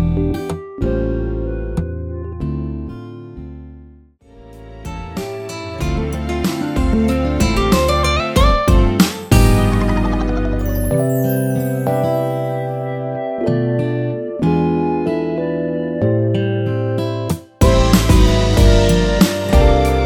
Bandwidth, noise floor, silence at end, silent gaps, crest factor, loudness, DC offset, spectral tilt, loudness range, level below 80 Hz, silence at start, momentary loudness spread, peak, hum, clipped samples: 19 kHz; -44 dBFS; 0 s; none; 16 dB; -17 LUFS; under 0.1%; -6 dB/octave; 13 LU; -22 dBFS; 0 s; 14 LU; 0 dBFS; none; under 0.1%